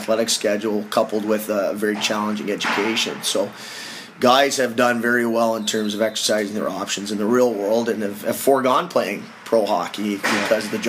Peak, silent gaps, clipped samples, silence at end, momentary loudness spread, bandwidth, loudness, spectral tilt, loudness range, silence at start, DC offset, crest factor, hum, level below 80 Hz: -2 dBFS; none; under 0.1%; 0 s; 7 LU; 15.5 kHz; -20 LUFS; -3 dB/octave; 2 LU; 0 s; under 0.1%; 18 dB; none; -70 dBFS